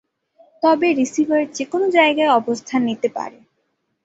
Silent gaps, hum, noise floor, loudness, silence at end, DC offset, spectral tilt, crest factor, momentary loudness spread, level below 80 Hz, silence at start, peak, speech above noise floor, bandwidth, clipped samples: none; none; -70 dBFS; -18 LUFS; 0.75 s; under 0.1%; -3.5 dB/octave; 18 dB; 9 LU; -66 dBFS; 0.6 s; -2 dBFS; 53 dB; 8 kHz; under 0.1%